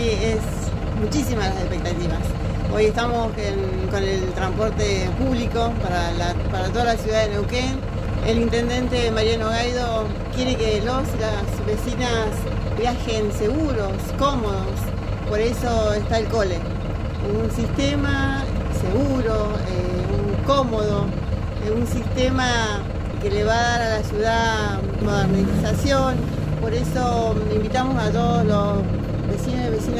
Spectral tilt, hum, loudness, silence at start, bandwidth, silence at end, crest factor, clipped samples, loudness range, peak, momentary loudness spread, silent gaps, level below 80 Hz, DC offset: -6 dB/octave; none; -22 LUFS; 0 s; 15.5 kHz; 0 s; 14 dB; under 0.1%; 2 LU; -6 dBFS; 5 LU; none; -28 dBFS; under 0.1%